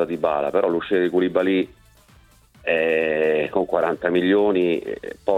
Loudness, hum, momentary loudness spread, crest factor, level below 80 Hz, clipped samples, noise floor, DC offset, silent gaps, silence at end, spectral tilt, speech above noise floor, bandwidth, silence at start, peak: -21 LUFS; none; 7 LU; 16 dB; -56 dBFS; under 0.1%; -53 dBFS; under 0.1%; none; 0 s; -7 dB/octave; 33 dB; 11 kHz; 0 s; -6 dBFS